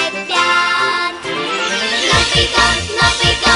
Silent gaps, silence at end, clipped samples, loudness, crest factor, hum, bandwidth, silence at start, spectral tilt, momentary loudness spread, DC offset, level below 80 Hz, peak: none; 0 s; under 0.1%; -13 LUFS; 14 dB; none; 11 kHz; 0 s; -2 dB/octave; 7 LU; under 0.1%; -32 dBFS; 0 dBFS